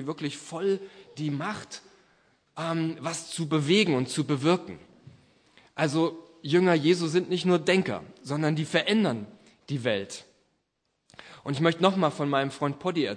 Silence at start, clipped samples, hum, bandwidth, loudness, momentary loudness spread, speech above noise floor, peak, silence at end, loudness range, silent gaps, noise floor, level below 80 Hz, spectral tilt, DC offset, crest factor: 0 s; under 0.1%; none; 10.5 kHz; -27 LUFS; 17 LU; 51 dB; -6 dBFS; 0 s; 5 LU; none; -77 dBFS; -72 dBFS; -5.5 dB/octave; under 0.1%; 22 dB